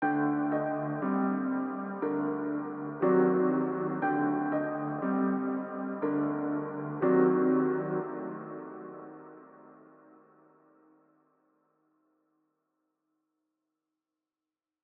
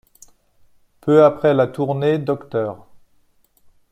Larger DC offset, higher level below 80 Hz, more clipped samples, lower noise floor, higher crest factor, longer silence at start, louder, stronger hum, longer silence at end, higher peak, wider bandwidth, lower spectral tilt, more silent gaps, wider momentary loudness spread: neither; second, -80 dBFS vs -58 dBFS; neither; first, under -90 dBFS vs -58 dBFS; about the same, 18 dB vs 18 dB; second, 0 s vs 1.05 s; second, -30 LUFS vs -18 LUFS; neither; first, 5.15 s vs 1.15 s; second, -14 dBFS vs -2 dBFS; second, 3.3 kHz vs 10.5 kHz; first, -12 dB/octave vs -8 dB/octave; neither; about the same, 16 LU vs 15 LU